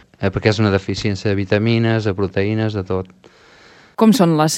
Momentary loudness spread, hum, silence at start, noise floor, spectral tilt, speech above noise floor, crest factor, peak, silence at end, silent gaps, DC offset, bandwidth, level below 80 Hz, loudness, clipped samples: 10 LU; none; 0.2 s; -46 dBFS; -6 dB/octave; 30 dB; 18 dB; 0 dBFS; 0 s; none; under 0.1%; 16 kHz; -46 dBFS; -17 LUFS; under 0.1%